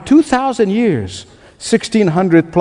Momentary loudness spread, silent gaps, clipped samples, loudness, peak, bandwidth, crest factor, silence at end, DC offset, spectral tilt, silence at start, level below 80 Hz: 15 LU; none; under 0.1%; -14 LUFS; 0 dBFS; 10.5 kHz; 14 dB; 0 s; under 0.1%; -6 dB/octave; 0 s; -48 dBFS